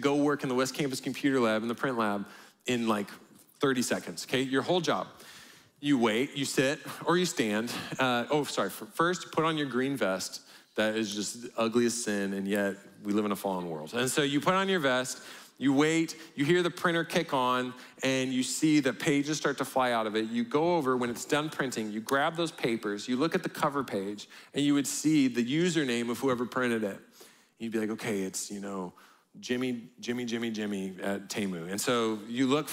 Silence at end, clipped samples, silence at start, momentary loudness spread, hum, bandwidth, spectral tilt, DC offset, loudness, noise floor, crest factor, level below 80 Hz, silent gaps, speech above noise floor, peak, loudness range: 0 s; under 0.1%; 0 s; 9 LU; none; 16 kHz; -4 dB/octave; under 0.1%; -30 LUFS; -57 dBFS; 18 dB; -74 dBFS; none; 27 dB; -12 dBFS; 5 LU